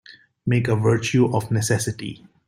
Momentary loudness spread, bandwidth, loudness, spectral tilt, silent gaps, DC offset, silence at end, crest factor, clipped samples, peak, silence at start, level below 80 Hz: 12 LU; 15.5 kHz; -21 LUFS; -5.5 dB/octave; none; under 0.1%; 0.3 s; 16 dB; under 0.1%; -6 dBFS; 0.45 s; -54 dBFS